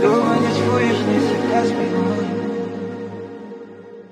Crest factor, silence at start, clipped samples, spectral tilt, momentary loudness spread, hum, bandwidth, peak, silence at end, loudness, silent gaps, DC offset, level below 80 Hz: 16 dB; 0 s; under 0.1%; -6.5 dB/octave; 18 LU; none; 12 kHz; -4 dBFS; 0.05 s; -19 LUFS; none; under 0.1%; -60 dBFS